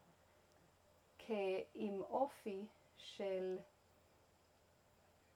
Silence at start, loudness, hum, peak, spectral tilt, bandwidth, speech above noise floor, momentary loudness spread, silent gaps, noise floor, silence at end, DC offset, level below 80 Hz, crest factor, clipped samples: 1.2 s; -45 LUFS; none; -28 dBFS; -6 dB/octave; 17 kHz; 29 dB; 15 LU; none; -73 dBFS; 1.7 s; under 0.1%; -84 dBFS; 20 dB; under 0.1%